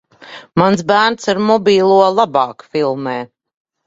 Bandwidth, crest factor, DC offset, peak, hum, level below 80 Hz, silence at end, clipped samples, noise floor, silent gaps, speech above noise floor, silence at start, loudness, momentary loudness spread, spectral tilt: 7.8 kHz; 14 dB; under 0.1%; 0 dBFS; none; -58 dBFS; 0.6 s; under 0.1%; -37 dBFS; none; 24 dB; 0.2 s; -14 LUFS; 11 LU; -5.5 dB/octave